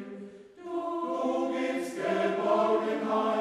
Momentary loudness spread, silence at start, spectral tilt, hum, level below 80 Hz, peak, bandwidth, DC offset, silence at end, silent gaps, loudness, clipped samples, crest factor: 17 LU; 0 s; -5.5 dB/octave; none; -76 dBFS; -14 dBFS; 13.5 kHz; under 0.1%; 0 s; none; -29 LUFS; under 0.1%; 16 dB